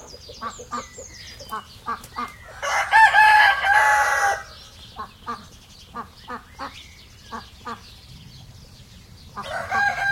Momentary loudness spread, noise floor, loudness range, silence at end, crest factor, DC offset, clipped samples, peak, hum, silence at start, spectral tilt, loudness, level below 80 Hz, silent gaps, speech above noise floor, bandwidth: 24 LU; -46 dBFS; 21 LU; 0 s; 22 dB; under 0.1%; under 0.1%; -2 dBFS; none; 0 s; -1.5 dB/octave; -18 LUFS; -52 dBFS; none; 12 dB; 16.5 kHz